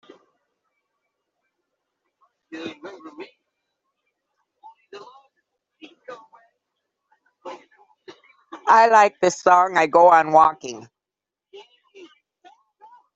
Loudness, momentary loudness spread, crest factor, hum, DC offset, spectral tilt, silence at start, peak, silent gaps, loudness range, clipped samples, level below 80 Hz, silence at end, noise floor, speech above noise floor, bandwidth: -16 LUFS; 27 LU; 20 dB; none; under 0.1%; -3.5 dB/octave; 2.55 s; -2 dBFS; none; 25 LU; under 0.1%; -70 dBFS; 2.35 s; -88 dBFS; 72 dB; 8 kHz